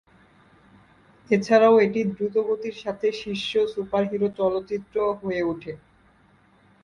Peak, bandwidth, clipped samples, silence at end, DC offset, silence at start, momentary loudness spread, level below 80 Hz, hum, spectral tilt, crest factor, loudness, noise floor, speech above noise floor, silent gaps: -6 dBFS; 9.6 kHz; under 0.1%; 1.05 s; under 0.1%; 1.3 s; 12 LU; -60 dBFS; none; -6 dB/octave; 20 dB; -23 LUFS; -58 dBFS; 35 dB; none